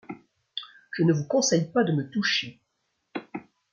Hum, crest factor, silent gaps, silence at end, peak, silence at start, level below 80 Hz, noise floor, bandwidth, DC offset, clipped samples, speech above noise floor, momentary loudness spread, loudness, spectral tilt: none; 18 dB; none; 0.3 s; -10 dBFS; 0.1 s; -72 dBFS; -77 dBFS; 7.6 kHz; under 0.1%; under 0.1%; 52 dB; 19 LU; -25 LUFS; -4.5 dB/octave